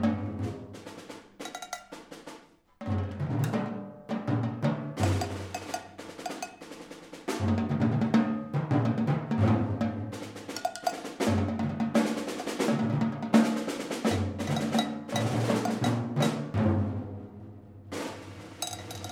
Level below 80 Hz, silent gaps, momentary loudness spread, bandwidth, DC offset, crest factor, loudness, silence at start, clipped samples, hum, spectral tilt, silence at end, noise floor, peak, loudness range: -62 dBFS; none; 18 LU; 16 kHz; under 0.1%; 22 dB; -30 LUFS; 0 s; under 0.1%; none; -6 dB/octave; 0 s; -53 dBFS; -8 dBFS; 6 LU